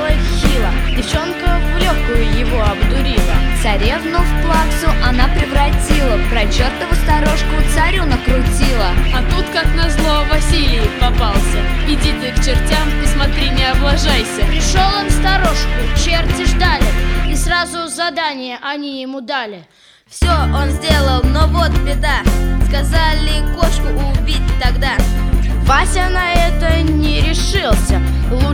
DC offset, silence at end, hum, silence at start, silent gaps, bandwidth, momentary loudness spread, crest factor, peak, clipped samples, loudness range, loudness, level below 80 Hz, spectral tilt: under 0.1%; 0 s; none; 0 s; none; 15.5 kHz; 4 LU; 12 dB; 0 dBFS; under 0.1%; 2 LU; -15 LUFS; -14 dBFS; -4.5 dB/octave